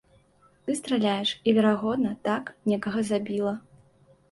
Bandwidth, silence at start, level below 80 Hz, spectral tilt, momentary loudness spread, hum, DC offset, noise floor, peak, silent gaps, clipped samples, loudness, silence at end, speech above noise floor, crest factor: 11.5 kHz; 0.65 s; -66 dBFS; -5.5 dB/octave; 9 LU; none; under 0.1%; -61 dBFS; -10 dBFS; none; under 0.1%; -26 LUFS; 0.75 s; 35 dB; 18 dB